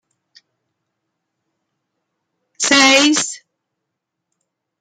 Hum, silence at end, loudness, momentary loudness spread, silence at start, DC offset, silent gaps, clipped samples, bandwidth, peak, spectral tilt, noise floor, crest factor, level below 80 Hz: none; 1.45 s; -12 LUFS; 15 LU; 2.6 s; under 0.1%; none; under 0.1%; 13.5 kHz; 0 dBFS; -0.5 dB/octave; -78 dBFS; 20 dB; -68 dBFS